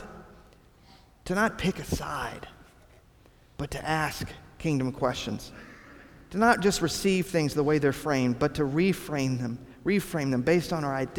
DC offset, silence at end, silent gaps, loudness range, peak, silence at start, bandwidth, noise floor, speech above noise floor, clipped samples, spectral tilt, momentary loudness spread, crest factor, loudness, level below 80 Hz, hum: under 0.1%; 0 s; none; 8 LU; -8 dBFS; 0 s; 20 kHz; -57 dBFS; 30 dB; under 0.1%; -5.5 dB/octave; 14 LU; 20 dB; -28 LUFS; -50 dBFS; none